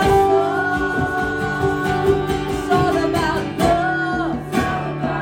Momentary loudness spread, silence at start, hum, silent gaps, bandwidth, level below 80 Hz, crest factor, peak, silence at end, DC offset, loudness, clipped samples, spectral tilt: 5 LU; 0 s; none; none; 16.5 kHz; -36 dBFS; 14 dB; -4 dBFS; 0 s; under 0.1%; -19 LUFS; under 0.1%; -6 dB/octave